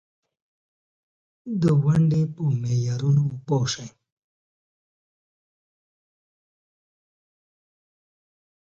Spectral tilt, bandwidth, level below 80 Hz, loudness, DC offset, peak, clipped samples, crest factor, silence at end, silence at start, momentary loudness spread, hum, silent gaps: -7 dB/octave; 7.8 kHz; -58 dBFS; -23 LUFS; under 0.1%; -10 dBFS; under 0.1%; 18 dB; 4.75 s; 1.45 s; 13 LU; none; none